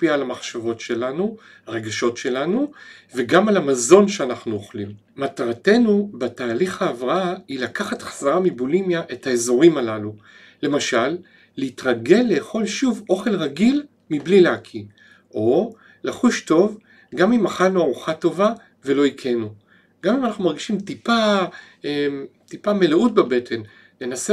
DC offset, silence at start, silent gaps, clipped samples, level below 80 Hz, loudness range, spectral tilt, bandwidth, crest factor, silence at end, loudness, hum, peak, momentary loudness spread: under 0.1%; 0 s; none; under 0.1%; -64 dBFS; 3 LU; -5 dB/octave; 12.5 kHz; 20 dB; 0 s; -20 LUFS; none; 0 dBFS; 14 LU